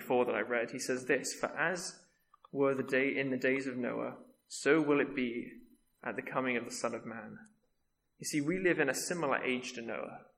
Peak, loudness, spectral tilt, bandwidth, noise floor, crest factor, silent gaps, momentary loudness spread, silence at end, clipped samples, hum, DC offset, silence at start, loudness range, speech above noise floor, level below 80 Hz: -16 dBFS; -34 LUFS; -4 dB/octave; 16.5 kHz; -79 dBFS; 18 dB; none; 13 LU; 0.15 s; under 0.1%; none; under 0.1%; 0 s; 4 LU; 45 dB; -72 dBFS